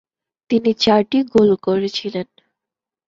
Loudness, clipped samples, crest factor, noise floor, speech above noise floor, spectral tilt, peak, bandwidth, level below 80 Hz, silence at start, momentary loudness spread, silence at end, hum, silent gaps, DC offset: -17 LUFS; under 0.1%; 18 dB; -86 dBFS; 70 dB; -6 dB/octave; -2 dBFS; 7.6 kHz; -56 dBFS; 0.5 s; 12 LU; 0.85 s; none; none; under 0.1%